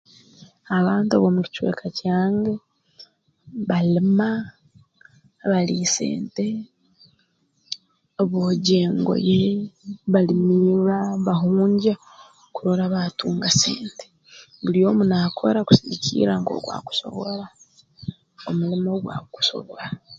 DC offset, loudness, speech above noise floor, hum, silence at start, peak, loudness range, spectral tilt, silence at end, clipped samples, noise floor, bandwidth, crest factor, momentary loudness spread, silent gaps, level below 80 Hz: under 0.1%; -21 LUFS; 45 dB; none; 0.7 s; 0 dBFS; 6 LU; -5.5 dB/octave; 0 s; under 0.1%; -66 dBFS; 7.8 kHz; 22 dB; 16 LU; none; -58 dBFS